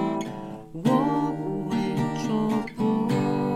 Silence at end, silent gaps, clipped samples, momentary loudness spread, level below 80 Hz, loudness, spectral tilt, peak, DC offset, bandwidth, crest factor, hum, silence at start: 0 s; none; under 0.1%; 8 LU; -54 dBFS; -26 LUFS; -7 dB/octave; -10 dBFS; under 0.1%; 13.5 kHz; 16 dB; none; 0 s